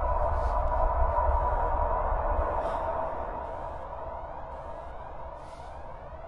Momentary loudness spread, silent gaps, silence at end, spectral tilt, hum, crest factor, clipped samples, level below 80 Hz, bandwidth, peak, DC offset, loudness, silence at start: 15 LU; none; 0 s; -8.5 dB/octave; none; 18 dB; under 0.1%; -34 dBFS; 5.6 kHz; -12 dBFS; under 0.1%; -31 LUFS; 0 s